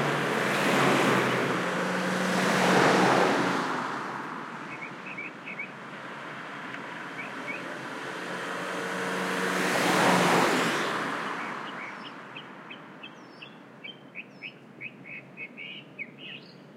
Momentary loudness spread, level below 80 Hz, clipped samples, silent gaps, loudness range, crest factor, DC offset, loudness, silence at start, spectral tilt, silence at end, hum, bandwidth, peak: 20 LU; -76 dBFS; under 0.1%; none; 17 LU; 20 dB; under 0.1%; -27 LUFS; 0 s; -4 dB/octave; 0 s; none; 16.5 kHz; -10 dBFS